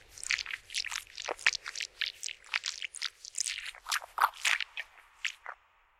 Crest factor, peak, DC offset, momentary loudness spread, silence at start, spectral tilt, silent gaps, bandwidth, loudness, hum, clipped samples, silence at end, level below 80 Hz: 28 dB; -10 dBFS; under 0.1%; 10 LU; 0.1 s; 3 dB/octave; none; 16.5 kHz; -34 LUFS; none; under 0.1%; 0.45 s; -70 dBFS